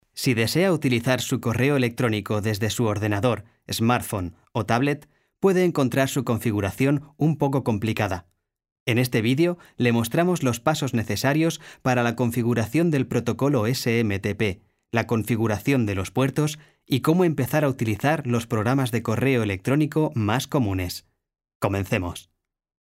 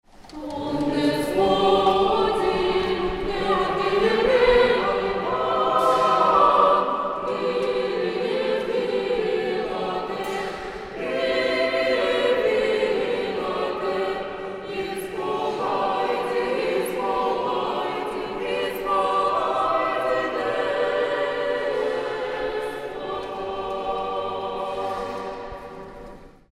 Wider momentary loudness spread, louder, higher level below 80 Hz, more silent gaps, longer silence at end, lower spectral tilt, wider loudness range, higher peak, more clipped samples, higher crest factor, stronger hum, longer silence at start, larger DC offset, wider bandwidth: second, 6 LU vs 12 LU; about the same, -23 LUFS vs -23 LUFS; second, -54 dBFS vs -46 dBFS; first, 8.72-8.86 s, 21.55-21.60 s vs none; first, 0.7 s vs 0.2 s; about the same, -6 dB/octave vs -5 dB/octave; second, 2 LU vs 7 LU; about the same, -6 dBFS vs -4 dBFS; neither; about the same, 18 dB vs 18 dB; neither; about the same, 0.15 s vs 0.2 s; neither; about the same, 16 kHz vs 15 kHz